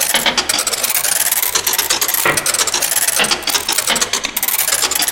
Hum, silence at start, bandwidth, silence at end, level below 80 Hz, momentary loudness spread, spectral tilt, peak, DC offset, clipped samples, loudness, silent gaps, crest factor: none; 0 s; 18 kHz; 0 s; -48 dBFS; 2 LU; 0.5 dB/octave; 0 dBFS; 0.1%; under 0.1%; -13 LUFS; none; 16 dB